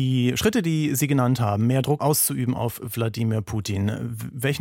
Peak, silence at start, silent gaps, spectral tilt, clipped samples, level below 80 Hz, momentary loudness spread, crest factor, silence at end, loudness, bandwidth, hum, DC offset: -8 dBFS; 0 s; none; -5.5 dB/octave; under 0.1%; -52 dBFS; 7 LU; 16 dB; 0 s; -23 LUFS; 17 kHz; none; under 0.1%